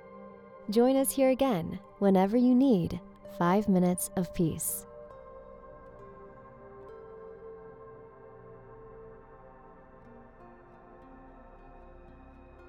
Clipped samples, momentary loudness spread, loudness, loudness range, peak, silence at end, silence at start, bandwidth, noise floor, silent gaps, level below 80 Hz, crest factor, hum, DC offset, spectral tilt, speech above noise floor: under 0.1%; 26 LU; -27 LUFS; 24 LU; -12 dBFS; 3.55 s; 0.05 s; over 20 kHz; -53 dBFS; none; -58 dBFS; 18 dB; none; under 0.1%; -6 dB/octave; 27 dB